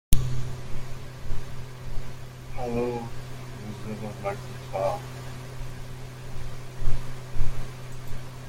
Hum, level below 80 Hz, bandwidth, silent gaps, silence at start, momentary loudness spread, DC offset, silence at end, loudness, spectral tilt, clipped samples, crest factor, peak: none; -32 dBFS; 16 kHz; none; 0.1 s; 11 LU; under 0.1%; 0 s; -35 LUFS; -6 dB/octave; under 0.1%; 22 dB; -2 dBFS